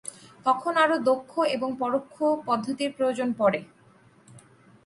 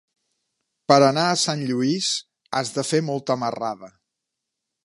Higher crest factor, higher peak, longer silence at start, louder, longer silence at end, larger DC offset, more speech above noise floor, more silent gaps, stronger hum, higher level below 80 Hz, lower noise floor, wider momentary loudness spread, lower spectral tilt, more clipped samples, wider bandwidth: about the same, 20 dB vs 24 dB; second, -8 dBFS vs 0 dBFS; second, 0.05 s vs 0.9 s; second, -26 LUFS vs -22 LUFS; second, 0.45 s vs 0.95 s; neither; second, 32 dB vs 61 dB; neither; neither; about the same, -72 dBFS vs -72 dBFS; second, -57 dBFS vs -82 dBFS; second, 7 LU vs 13 LU; about the same, -4.5 dB/octave vs -4 dB/octave; neither; about the same, 11.5 kHz vs 11.5 kHz